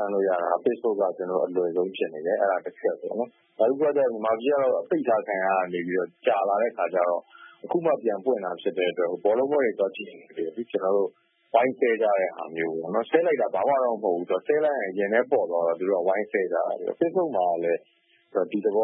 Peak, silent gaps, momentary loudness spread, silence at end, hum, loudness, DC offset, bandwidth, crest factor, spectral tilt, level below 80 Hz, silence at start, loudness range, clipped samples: -6 dBFS; none; 7 LU; 0 s; none; -25 LUFS; under 0.1%; 3.7 kHz; 20 dB; -10 dB/octave; -82 dBFS; 0 s; 2 LU; under 0.1%